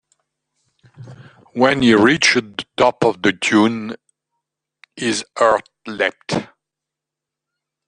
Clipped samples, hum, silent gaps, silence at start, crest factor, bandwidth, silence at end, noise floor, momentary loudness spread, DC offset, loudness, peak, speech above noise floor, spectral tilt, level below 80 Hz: under 0.1%; none; none; 1 s; 18 dB; 10 kHz; 1.4 s; -85 dBFS; 16 LU; under 0.1%; -17 LUFS; -2 dBFS; 68 dB; -4 dB/octave; -56 dBFS